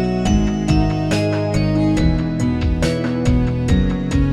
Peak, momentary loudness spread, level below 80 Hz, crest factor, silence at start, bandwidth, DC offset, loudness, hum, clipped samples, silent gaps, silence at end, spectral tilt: -4 dBFS; 2 LU; -24 dBFS; 12 dB; 0 s; 12.5 kHz; under 0.1%; -18 LUFS; none; under 0.1%; none; 0 s; -7 dB/octave